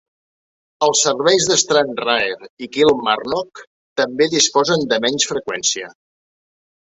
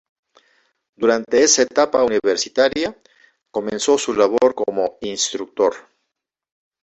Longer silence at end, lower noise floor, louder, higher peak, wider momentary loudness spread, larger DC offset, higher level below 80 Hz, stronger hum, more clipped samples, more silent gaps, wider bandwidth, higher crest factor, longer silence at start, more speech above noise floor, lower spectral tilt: about the same, 1.05 s vs 1.05 s; first, under -90 dBFS vs -79 dBFS; about the same, -17 LUFS vs -18 LUFS; about the same, 0 dBFS vs -2 dBFS; about the same, 11 LU vs 11 LU; neither; about the same, -60 dBFS vs -58 dBFS; neither; neither; first, 2.50-2.57 s, 3.67-3.96 s vs none; about the same, 8.4 kHz vs 8.2 kHz; about the same, 18 dB vs 18 dB; second, 0.8 s vs 1 s; first, over 73 dB vs 61 dB; about the same, -2 dB/octave vs -2 dB/octave